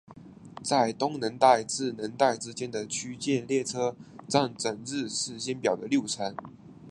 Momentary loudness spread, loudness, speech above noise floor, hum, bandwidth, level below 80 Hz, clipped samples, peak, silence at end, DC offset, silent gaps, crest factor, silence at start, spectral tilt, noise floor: 10 LU; -28 LUFS; 20 dB; none; 11.5 kHz; -68 dBFS; under 0.1%; -6 dBFS; 0 s; under 0.1%; none; 22 dB; 0.1 s; -3.5 dB/octave; -48 dBFS